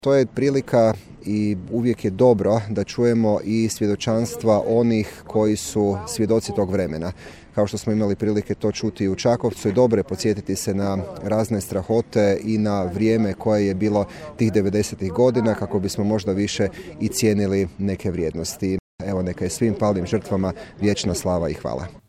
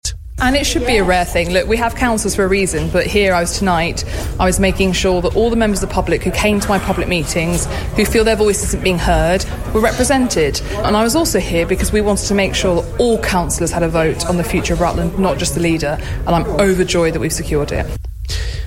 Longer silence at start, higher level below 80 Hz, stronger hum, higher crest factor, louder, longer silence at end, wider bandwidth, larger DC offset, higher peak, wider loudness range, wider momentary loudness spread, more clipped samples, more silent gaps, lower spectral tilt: about the same, 0.05 s vs 0.05 s; second, -48 dBFS vs -24 dBFS; neither; about the same, 16 dB vs 14 dB; second, -22 LUFS vs -16 LUFS; about the same, 0.1 s vs 0 s; about the same, 15.5 kHz vs 16.5 kHz; neither; second, -4 dBFS vs 0 dBFS; about the same, 3 LU vs 1 LU; about the same, 7 LU vs 5 LU; neither; first, 18.79-18.98 s vs none; first, -6 dB/octave vs -4.5 dB/octave